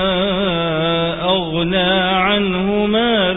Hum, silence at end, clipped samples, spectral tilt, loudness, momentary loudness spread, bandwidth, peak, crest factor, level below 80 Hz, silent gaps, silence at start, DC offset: none; 0 s; under 0.1%; -11 dB/octave; -16 LUFS; 3 LU; 4 kHz; -4 dBFS; 12 dB; -40 dBFS; none; 0 s; under 0.1%